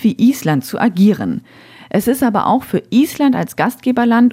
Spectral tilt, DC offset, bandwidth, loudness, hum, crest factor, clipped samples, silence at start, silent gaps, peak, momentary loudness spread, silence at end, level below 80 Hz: -6.5 dB/octave; under 0.1%; 16.5 kHz; -15 LUFS; none; 12 dB; under 0.1%; 0 s; none; -2 dBFS; 6 LU; 0 s; -54 dBFS